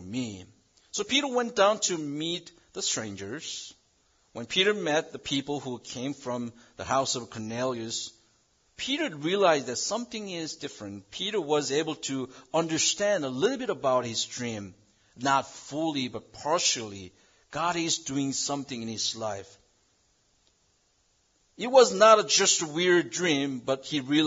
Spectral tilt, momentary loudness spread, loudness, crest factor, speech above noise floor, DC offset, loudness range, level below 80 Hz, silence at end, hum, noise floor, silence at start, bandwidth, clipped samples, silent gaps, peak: -2.5 dB/octave; 14 LU; -27 LUFS; 22 dB; 41 dB; under 0.1%; 8 LU; -70 dBFS; 0 s; none; -69 dBFS; 0 s; 7.8 kHz; under 0.1%; none; -6 dBFS